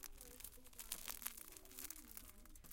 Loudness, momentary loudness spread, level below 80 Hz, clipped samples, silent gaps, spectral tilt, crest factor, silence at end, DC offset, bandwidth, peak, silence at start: -52 LUFS; 9 LU; -64 dBFS; under 0.1%; none; -1 dB/octave; 36 dB; 0 s; under 0.1%; 17 kHz; -18 dBFS; 0 s